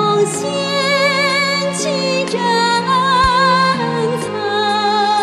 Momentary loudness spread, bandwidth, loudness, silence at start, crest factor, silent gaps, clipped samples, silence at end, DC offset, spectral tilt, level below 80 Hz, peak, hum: 6 LU; 14 kHz; -15 LUFS; 0 s; 12 dB; none; under 0.1%; 0 s; under 0.1%; -3.5 dB/octave; -40 dBFS; -2 dBFS; none